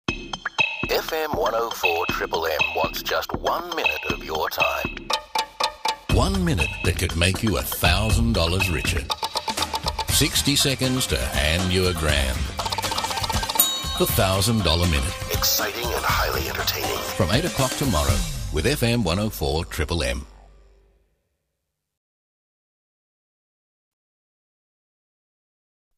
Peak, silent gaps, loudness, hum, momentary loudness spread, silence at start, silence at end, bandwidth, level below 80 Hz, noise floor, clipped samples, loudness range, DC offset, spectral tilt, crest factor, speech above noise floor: -2 dBFS; none; -22 LUFS; none; 6 LU; 0.1 s; 5.55 s; 15.5 kHz; -34 dBFS; -80 dBFS; under 0.1%; 4 LU; under 0.1%; -3.5 dB/octave; 22 dB; 57 dB